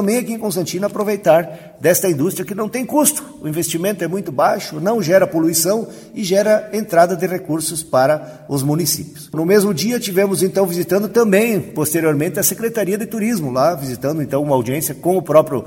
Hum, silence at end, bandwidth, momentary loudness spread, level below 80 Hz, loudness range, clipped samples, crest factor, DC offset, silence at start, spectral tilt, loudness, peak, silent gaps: none; 0 s; 17 kHz; 8 LU; -56 dBFS; 2 LU; under 0.1%; 16 dB; under 0.1%; 0 s; -4.5 dB/octave; -17 LUFS; 0 dBFS; none